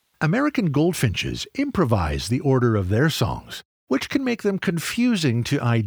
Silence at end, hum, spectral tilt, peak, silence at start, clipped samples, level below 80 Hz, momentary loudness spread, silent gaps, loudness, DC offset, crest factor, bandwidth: 0 s; none; -6 dB/octave; -6 dBFS; 0.2 s; under 0.1%; -42 dBFS; 6 LU; 3.65-3.87 s; -22 LUFS; under 0.1%; 16 dB; over 20 kHz